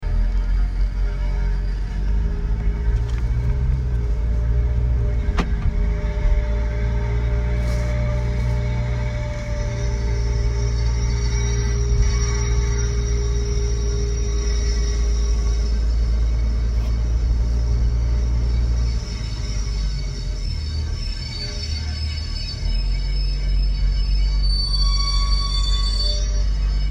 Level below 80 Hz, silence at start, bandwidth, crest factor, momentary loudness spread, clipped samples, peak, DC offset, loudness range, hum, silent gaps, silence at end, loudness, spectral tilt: -20 dBFS; 0 s; 9.6 kHz; 14 dB; 5 LU; under 0.1%; -6 dBFS; under 0.1%; 4 LU; none; none; 0 s; -23 LUFS; -5 dB/octave